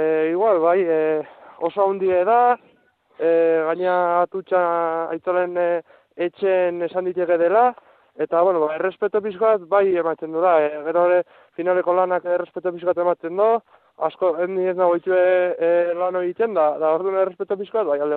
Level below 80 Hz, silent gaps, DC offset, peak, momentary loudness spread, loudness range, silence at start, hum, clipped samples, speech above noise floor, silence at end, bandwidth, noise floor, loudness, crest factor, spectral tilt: -70 dBFS; none; under 0.1%; -6 dBFS; 7 LU; 2 LU; 0 s; none; under 0.1%; 39 dB; 0 s; 4.3 kHz; -59 dBFS; -20 LUFS; 14 dB; -9.5 dB/octave